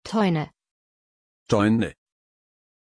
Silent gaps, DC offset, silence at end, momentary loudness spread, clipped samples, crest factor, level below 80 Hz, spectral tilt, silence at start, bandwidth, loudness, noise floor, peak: 0.71-1.46 s; under 0.1%; 0.9 s; 10 LU; under 0.1%; 18 dB; -56 dBFS; -6.5 dB/octave; 0.05 s; 10.5 kHz; -23 LUFS; under -90 dBFS; -8 dBFS